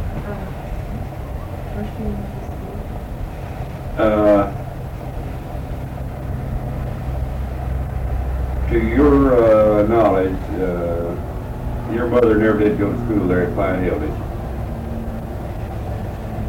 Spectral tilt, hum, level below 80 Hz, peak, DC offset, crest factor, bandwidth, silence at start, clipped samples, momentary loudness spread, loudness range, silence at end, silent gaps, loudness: -9 dB/octave; none; -28 dBFS; -6 dBFS; under 0.1%; 14 dB; 16.5 kHz; 0 s; under 0.1%; 15 LU; 11 LU; 0 s; none; -20 LUFS